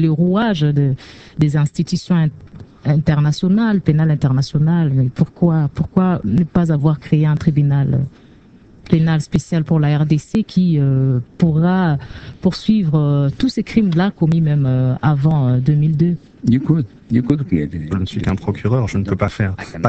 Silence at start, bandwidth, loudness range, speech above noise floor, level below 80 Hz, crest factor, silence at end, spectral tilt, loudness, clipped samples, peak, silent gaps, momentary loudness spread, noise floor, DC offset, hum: 0 s; 8.2 kHz; 2 LU; 29 dB; -40 dBFS; 16 dB; 0 s; -8.5 dB/octave; -16 LUFS; under 0.1%; 0 dBFS; none; 5 LU; -45 dBFS; under 0.1%; none